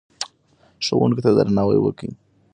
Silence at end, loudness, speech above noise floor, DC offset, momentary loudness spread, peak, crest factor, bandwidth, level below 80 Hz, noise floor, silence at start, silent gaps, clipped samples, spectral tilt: 0.4 s; -19 LUFS; 40 dB; under 0.1%; 15 LU; -2 dBFS; 18 dB; 10.5 kHz; -52 dBFS; -58 dBFS; 0.2 s; none; under 0.1%; -6.5 dB/octave